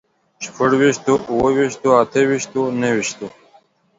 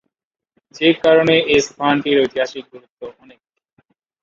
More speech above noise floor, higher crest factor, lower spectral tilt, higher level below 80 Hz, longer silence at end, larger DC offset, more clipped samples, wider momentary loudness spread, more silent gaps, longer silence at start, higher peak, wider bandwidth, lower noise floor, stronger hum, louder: second, 37 dB vs 64 dB; about the same, 18 dB vs 18 dB; about the same, -5 dB/octave vs -4.5 dB/octave; about the same, -54 dBFS vs -54 dBFS; second, 0.7 s vs 1.1 s; neither; neither; second, 16 LU vs 23 LU; second, none vs 2.90-2.97 s; second, 0.4 s vs 0.75 s; about the same, 0 dBFS vs -2 dBFS; about the same, 7.8 kHz vs 7.6 kHz; second, -54 dBFS vs -80 dBFS; neither; about the same, -17 LUFS vs -15 LUFS